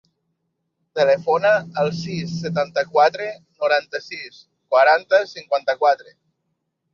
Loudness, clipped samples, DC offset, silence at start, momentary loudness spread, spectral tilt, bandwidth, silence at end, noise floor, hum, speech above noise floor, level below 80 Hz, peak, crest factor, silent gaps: -20 LUFS; under 0.1%; under 0.1%; 0.95 s; 14 LU; -5 dB/octave; 7.2 kHz; 0.9 s; -75 dBFS; none; 55 dB; -64 dBFS; -2 dBFS; 18 dB; none